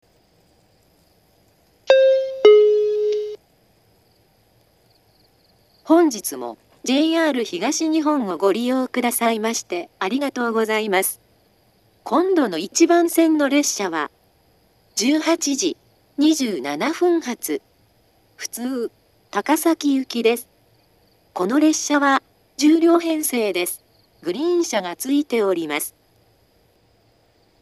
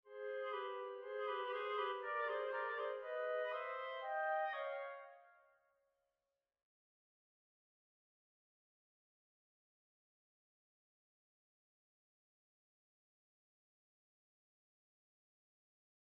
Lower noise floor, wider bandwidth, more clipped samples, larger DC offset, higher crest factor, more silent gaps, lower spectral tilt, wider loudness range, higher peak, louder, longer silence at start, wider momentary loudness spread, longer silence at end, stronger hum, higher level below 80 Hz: second, -59 dBFS vs under -90 dBFS; first, 13.5 kHz vs 5.6 kHz; neither; neither; about the same, 20 dB vs 18 dB; neither; first, -3 dB/octave vs 3 dB/octave; about the same, 6 LU vs 7 LU; first, 0 dBFS vs -30 dBFS; first, -19 LUFS vs -43 LUFS; first, 1.85 s vs 0.05 s; first, 13 LU vs 7 LU; second, 1.75 s vs 10.7 s; neither; first, -70 dBFS vs under -90 dBFS